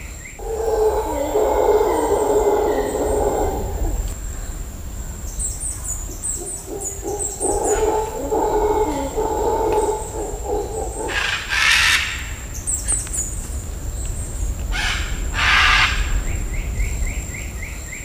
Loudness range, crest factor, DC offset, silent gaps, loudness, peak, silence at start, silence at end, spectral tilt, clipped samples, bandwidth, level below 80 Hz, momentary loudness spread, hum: 6 LU; 18 dB; under 0.1%; none; -20 LUFS; -2 dBFS; 0 s; 0 s; -3 dB/octave; under 0.1%; 16 kHz; -28 dBFS; 14 LU; none